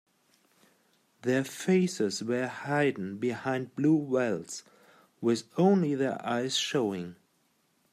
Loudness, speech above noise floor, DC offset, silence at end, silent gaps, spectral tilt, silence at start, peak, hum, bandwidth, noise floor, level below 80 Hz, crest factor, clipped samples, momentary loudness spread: -29 LUFS; 43 dB; under 0.1%; 0.8 s; none; -5.5 dB/octave; 1.25 s; -12 dBFS; none; 14.5 kHz; -71 dBFS; -78 dBFS; 18 dB; under 0.1%; 8 LU